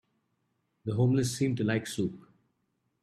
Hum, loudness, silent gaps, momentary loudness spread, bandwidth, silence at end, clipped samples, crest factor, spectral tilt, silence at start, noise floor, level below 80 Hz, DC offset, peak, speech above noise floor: none; -30 LUFS; none; 9 LU; 14 kHz; 0.85 s; under 0.1%; 16 dB; -6 dB/octave; 0.85 s; -78 dBFS; -64 dBFS; under 0.1%; -16 dBFS; 49 dB